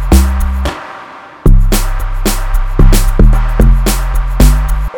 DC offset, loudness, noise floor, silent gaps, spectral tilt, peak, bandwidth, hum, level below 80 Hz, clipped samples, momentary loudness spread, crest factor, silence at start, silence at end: under 0.1%; -13 LUFS; -31 dBFS; none; -5.5 dB/octave; 0 dBFS; 18.5 kHz; none; -10 dBFS; 0.2%; 9 LU; 8 dB; 0 s; 0 s